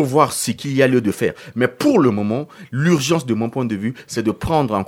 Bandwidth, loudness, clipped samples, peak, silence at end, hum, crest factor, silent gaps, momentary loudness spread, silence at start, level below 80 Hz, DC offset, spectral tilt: 17 kHz; -19 LUFS; under 0.1%; 0 dBFS; 0 s; none; 18 dB; none; 7 LU; 0 s; -46 dBFS; under 0.1%; -5.5 dB/octave